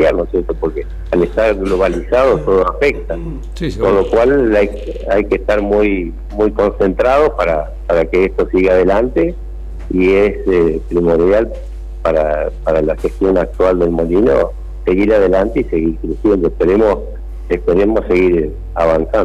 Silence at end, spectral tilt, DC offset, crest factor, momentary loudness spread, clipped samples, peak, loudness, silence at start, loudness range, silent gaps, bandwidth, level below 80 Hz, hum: 0 s; -8 dB/octave; under 0.1%; 10 dB; 9 LU; under 0.1%; -4 dBFS; -14 LUFS; 0 s; 1 LU; none; 11 kHz; -26 dBFS; none